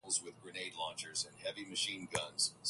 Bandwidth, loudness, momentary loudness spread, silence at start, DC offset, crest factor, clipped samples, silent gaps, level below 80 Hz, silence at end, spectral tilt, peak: 12 kHz; -39 LUFS; 8 LU; 0.05 s; under 0.1%; 24 dB; under 0.1%; none; -74 dBFS; 0 s; -0.5 dB/octave; -16 dBFS